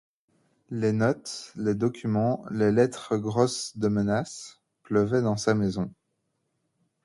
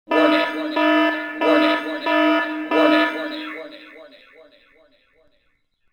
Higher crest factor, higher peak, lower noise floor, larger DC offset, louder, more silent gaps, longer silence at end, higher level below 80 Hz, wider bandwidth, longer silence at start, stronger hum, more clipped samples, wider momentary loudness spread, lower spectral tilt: about the same, 20 dB vs 18 dB; second, -8 dBFS vs -2 dBFS; first, -77 dBFS vs -65 dBFS; neither; second, -26 LUFS vs -19 LUFS; neither; second, 1.15 s vs 1.85 s; first, -58 dBFS vs -72 dBFS; first, 11.5 kHz vs 9.4 kHz; first, 0.7 s vs 0.1 s; neither; neither; second, 11 LU vs 14 LU; first, -6 dB/octave vs -4 dB/octave